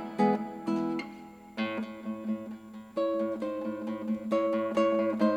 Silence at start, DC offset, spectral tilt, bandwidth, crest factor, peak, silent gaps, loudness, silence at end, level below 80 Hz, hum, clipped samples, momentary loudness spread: 0 s; under 0.1%; -7 dB/octave; 11 kHz; 18 dB; -14 dBFS; none; -31 LUFS; 0 s; -70 dBFS; none; under 0.1%; 12 LU